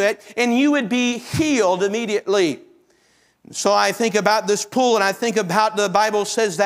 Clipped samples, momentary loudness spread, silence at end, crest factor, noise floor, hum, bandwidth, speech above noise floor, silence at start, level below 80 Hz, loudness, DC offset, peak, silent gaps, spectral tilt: under 0.1%; 5 LU; 0 s; 18 dB; -59 dBFS; none; 16 kHz; 41 dB; 0 s; -58 dBFS; -19 LUFS; under 0.1%; 0 dBFS; none; -3.5 dB/octave